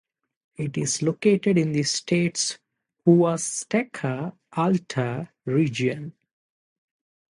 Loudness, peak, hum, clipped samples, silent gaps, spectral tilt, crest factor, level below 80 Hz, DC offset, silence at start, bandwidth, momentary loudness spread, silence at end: -24 LUFS; -4 dBFS; none; under 0.1%; none; -5 dB/octave; 20 dB; -66 dBFS; under 0.1%; 0.6 s; 11.5 kHz; 12 LU; 1.25 s